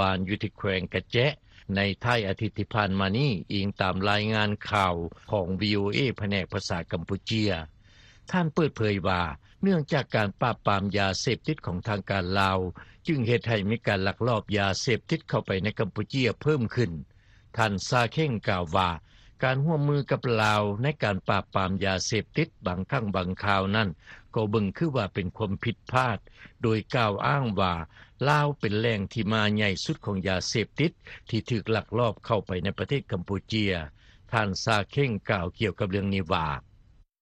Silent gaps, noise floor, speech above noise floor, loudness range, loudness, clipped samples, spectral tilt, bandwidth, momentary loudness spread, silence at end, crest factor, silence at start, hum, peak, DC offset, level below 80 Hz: none; -57 dBFS; 30 dB; 2 LU; -27 LUFS; under 0.1%; -5.5 dB/octave; 10.5 kHz; 7 LU; 0.6 s; 20 dB; 0 s; none; -8 dBFS; under 0.1%; -52 dBFS